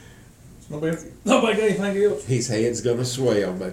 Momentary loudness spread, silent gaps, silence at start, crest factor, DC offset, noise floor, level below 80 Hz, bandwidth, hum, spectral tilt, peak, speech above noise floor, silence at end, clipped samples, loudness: 9 LU; none; 0 s; 20 dB; under 0.1%; -46 dBFS; -52 dBFS; 16 kHz; none; -5 dB/octave; -4 dBFS; 25 dB; 0 s; under 0.1%; -22 LUFS